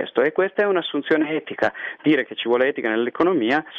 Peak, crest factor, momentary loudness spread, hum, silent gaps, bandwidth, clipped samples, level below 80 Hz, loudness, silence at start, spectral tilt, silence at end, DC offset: -6 dBFS; 14 dB; 4 LU; none; none; 6.8 kHz; under 0.1%; -66 dBFS; -21 LUFS; 0 s; -6.5 dB/octave; 0 s; under 0.1%